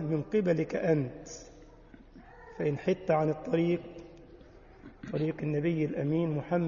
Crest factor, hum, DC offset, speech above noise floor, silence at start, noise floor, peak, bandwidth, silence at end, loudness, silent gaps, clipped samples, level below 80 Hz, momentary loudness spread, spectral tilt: 18 dB; none; under 0.1%; 24 dB; 0 s; -54 dBFS; -14 dBFS; 7.4 kHz; 0 s; -31 LUFS; none; under 0.1%; -58 dBFS; 19 LU; -8 dB/octave